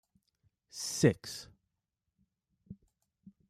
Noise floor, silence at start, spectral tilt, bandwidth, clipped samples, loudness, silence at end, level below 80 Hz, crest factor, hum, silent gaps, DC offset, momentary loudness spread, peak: -87 dBFS; 0.75 s; -5 dB/octave; 15.5 kHz; under 0.1%; -32 LUFS; 0.75 s; -70 dBFS; 26 dB; none; none; under 0.1%; 26 LU; -12 dBFS